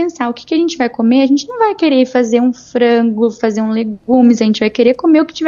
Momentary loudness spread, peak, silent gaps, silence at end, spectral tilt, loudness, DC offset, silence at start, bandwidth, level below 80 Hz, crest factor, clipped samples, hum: 6 LU; 0 dBFS; none; 0 s; -5.5 dB/octave; -13 LUFS; under 0.1%; 0 s; 7.4 kHz; -56 dBFS; 12 dB; under 0.1%; none